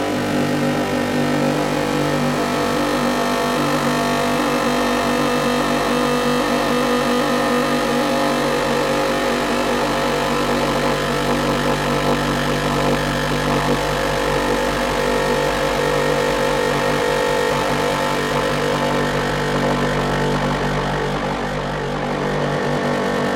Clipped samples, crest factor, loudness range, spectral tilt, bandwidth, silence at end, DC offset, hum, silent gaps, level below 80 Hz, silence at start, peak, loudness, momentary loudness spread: under 0.1%; 12 dB; 1 LU; -4.5 dB/octave; 16.5 kHz; 0 s; under 0.1%; none; none; -36 dBFS; 0 s; -8 dBFS; -19 LUFS; 2 LU